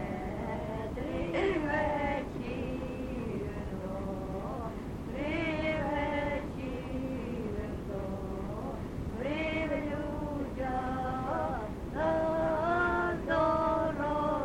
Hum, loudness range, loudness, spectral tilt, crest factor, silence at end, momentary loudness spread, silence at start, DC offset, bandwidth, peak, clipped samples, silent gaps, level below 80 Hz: none; 6 LU; -34 LUFS; -7.5 dB/octave; 16 dB; 0 s; 9 LU; 0 s; under 0.1%; 16.5 kHz; -16 dBFS; under 0.1%; none; -44 dBFS